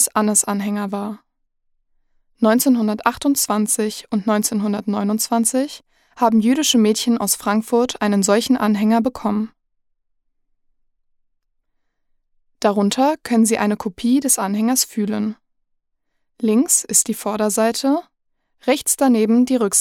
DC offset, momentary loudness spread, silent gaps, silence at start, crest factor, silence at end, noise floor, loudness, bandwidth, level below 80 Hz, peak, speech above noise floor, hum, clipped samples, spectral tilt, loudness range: under 0.1%; 8 LU; none; 0 s; 18 dB; 0 s; -70 dBFS; -18 LUFS; 16.5 kHz; -60 dBFS; -2 dBFS; 52 dB; none; under 0.1%; -3.5 dB/octave; 6 LU